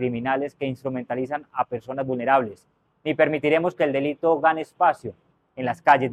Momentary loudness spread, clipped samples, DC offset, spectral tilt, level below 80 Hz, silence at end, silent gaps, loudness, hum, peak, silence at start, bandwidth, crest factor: 11 LU; under 0.1%; under 0.1%; -7 dB/octave; -66 dBFS; 0 s; none; -23 LUFS; none; -4 dBFS; 0 s; 12 kHz; 20 dB